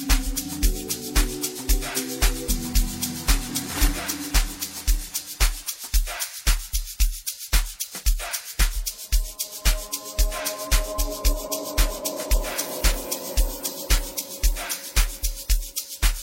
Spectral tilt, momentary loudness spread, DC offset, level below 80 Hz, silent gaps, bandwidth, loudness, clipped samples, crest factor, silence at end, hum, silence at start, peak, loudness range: -2.5 dB/octave; 5 LU; under 0.1%; -26 dBFS; none; 16.5 kHz; -26 LUFS; under 0.1%; 20 dB; 0 s; none; 0 s; -4 dBFS; 1 LU